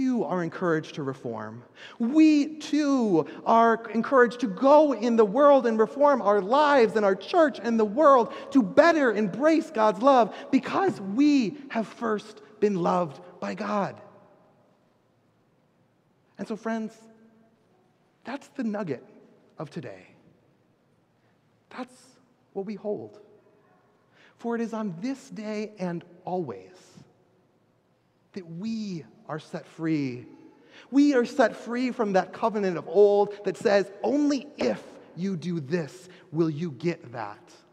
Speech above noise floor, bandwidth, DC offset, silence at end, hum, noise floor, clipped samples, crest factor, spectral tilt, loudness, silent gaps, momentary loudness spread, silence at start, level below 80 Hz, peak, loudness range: 42 dB; 10 kHz; under 0.1%; 0.35 s; none; -67 dBFS; under 0.1%; 22 dB; -6.5 dB/octave; -25 LUFS; none; 19 LU; 0 s; -78 dBFS; -4 dBFS; 18 LU